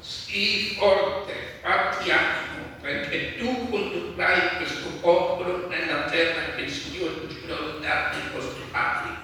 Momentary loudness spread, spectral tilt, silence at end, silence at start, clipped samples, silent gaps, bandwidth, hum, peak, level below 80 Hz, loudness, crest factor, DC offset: 10 LU; -4 dB/octave; 0 s; 0 s; under 0.1%; none; 18.5 kHz; none; -6 dBFS; -54 dBFS; -25 LUFS; 18 dB; under 0.1%